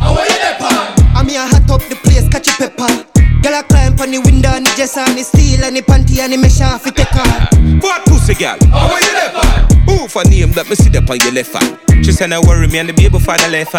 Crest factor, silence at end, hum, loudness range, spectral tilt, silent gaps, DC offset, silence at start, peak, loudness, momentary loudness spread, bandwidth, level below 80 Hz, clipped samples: 8 dB; 0 s; none; 1 LU; -5 dB/octave; none; under 0.1%; 0 s; 0 dBFS; -10 LUFS; 4 LU; 18 kHz; -12 dBFS; under 0.1%